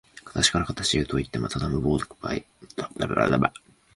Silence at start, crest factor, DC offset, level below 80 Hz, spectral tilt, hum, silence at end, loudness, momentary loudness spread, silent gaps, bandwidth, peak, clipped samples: 0.15 s; 22 dB; under 0.1%; -42 dBFS; -4 dB/octave; none; 0.45 s; -26 LUFS; 12 LU; none; 11.5 kHz; -4 dBFS; under 0.1%